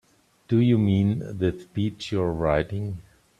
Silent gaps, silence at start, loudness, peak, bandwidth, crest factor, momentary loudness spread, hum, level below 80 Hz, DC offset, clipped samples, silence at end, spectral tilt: none; 0.5 s; -25 LUFS; -8 dBFS; 9.8 kHz; 18 dB; 10 LU; none; -48 dBFS; under 0.1%; under 0.1%; 0.4 s; -8.5 dB/octave